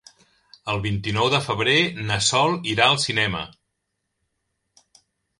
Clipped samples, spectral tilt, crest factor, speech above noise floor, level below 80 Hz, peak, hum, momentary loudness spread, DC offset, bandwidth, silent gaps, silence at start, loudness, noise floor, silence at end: under 0.1%; -3.5 dB/octave; 22 dB; 56 dB; -50 dBFS; -2 dBFS; none; 10 LU; under 0.1%; 11.5 kHz; none; 0.65 s; -20 LUFS; -78 dBFS; 1.9 s